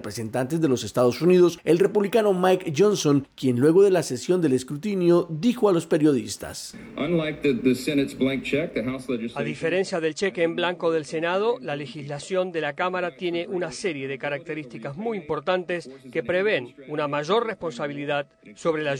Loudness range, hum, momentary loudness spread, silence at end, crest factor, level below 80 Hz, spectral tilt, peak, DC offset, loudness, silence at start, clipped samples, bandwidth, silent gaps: 7 LU; none; 11 LU; 0 s; 16 dB; -60 dBFS; -5.5 dB/octave; -8 dBFS; under 0.1%; -24 LUFS; 0 s; under 0.1%; 19 kHz; none